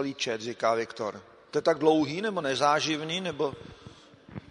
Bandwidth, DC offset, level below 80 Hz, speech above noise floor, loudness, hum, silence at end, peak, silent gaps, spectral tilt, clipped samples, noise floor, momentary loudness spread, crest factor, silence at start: 10.5 kHz; under 0.1%; -66 dBFS; 23 dB; -28 LUFS; none; 0.1 s; -10 dBFS; none; -4 dB/octave; under 0.1%; -51 dBFS; 21 LU; 20 dB; 0 s